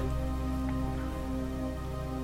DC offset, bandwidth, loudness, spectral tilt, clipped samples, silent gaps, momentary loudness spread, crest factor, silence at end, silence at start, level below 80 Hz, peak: 0.3%; 16 kHz; -35 LUFS; -7.5 dB/octave; under 0.1%; none; 3 LU; 12 dB; 0 s; 0 s; -36 dBFS; -22 dBFS